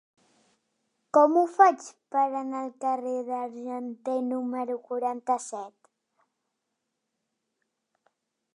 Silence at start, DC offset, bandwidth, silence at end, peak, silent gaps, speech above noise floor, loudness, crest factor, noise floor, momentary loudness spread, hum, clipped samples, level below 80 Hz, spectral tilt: 1.15 s; under 0.1%; 11 kHz; 2.85 s; -4 dBFS; none; 56 dB; -27 LUFS; 24 dB; -82 dBFS; 15 LU; none; under 0.1%; under -90 dBFS; -4 dB/octave